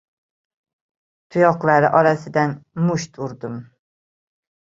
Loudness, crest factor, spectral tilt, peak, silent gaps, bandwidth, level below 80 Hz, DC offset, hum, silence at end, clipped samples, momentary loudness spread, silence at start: -18 LUFS; 20 dB; -7 dB/octave; -2 dBFS; none; 7.8 kHz; -62 dBFS; under 0.1%; none; 1.05 s; under 0.1%; 16 LU; 1.35 s